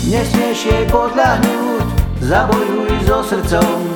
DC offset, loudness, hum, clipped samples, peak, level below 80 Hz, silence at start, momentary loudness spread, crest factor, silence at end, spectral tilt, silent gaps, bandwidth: under 0.1%; -15 LUFS; none; under 0.1%; 0 dBFS; -24 dBFS; 0 s; 4 LU; 14 dB; 0 s; -5.5 dB/octave; none; 19 kHz